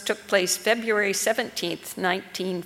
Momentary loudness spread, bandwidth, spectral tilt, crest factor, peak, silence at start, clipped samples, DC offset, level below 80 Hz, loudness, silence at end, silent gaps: 7 LU; 18 kHz; -2.5 dB/octave; 20 dB; -6 dBFS; 0 s; under 0.1%; under 0.1%; -68 dBFS; -24 LUFS; 0 s; none